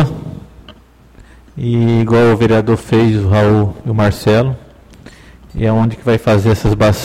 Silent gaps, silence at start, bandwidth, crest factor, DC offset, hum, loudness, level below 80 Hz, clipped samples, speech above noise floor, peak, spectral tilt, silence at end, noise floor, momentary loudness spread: none; 0 s; 14.5 kHz; 12 dB; under 0.1%; none; -13 LUFS; -34 dBFS; under 0.1%; 30 dB; -2 dBFS; -7.5 dB/octave; 0 s; -42 dBFS; 12 LU